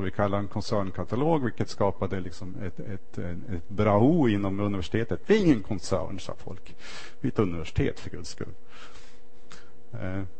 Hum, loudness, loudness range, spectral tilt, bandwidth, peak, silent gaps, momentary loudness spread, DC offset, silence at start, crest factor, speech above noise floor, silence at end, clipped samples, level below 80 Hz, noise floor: none; -28 LUFS; 8 LU; -7 dB/octave; 8.8 kHz; -8 dBFS; none; 20 LU; 3%; 0 s; 20 dB; 26 dB; 0.1 s; under 0.1%; -48 dBFS; -54 dBFS